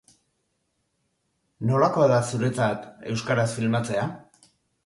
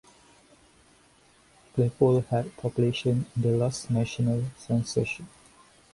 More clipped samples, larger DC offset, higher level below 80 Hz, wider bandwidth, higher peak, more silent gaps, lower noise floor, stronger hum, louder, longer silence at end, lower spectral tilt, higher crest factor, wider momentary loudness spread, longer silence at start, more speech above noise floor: neither; neither; about the same, -60 dBFS vs -58 dBFS; about the same, 11.5 kHz vs 11.5 kHz; about the same, -6 dBFS vs -8 dBFS; neither; first, -74 dBFS vs -60 dBFS; neither; first, -24 LUFS vs -27 LUFS; about the same, 0.65 s vs 0.65 s; about the same, -6 dB/octave vs -6.5 dB/octave; about the same, 20 dB vs 20 dB; first, 12 LU vs 8 LU; second, 1.6 s vs 1.75 s; first, 51 dB vs 34 dB